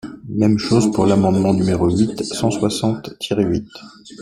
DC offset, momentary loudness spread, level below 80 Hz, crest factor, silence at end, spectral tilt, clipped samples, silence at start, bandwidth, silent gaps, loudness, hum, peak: under 0.1%; 10 LU; -46 dBFS; 16 dB; 0 s; -6.5 dB/octave; under 0.1%; 0.05 s; 13 kHz; none; -18 LUFS; none; -2 dBFS